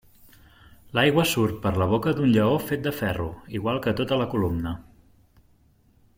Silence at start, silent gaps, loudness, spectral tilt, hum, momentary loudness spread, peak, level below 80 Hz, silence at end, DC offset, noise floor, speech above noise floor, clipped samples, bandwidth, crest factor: 0.85 s; none; -24 LUFS; -6 dB/octave; none; 10 LU; -6 dBFS; -50 dBFS; 1.35 s; under 0.1%; -60 dBFS; 37 dB; under 0.1%; 16.5 kHz; 18 dB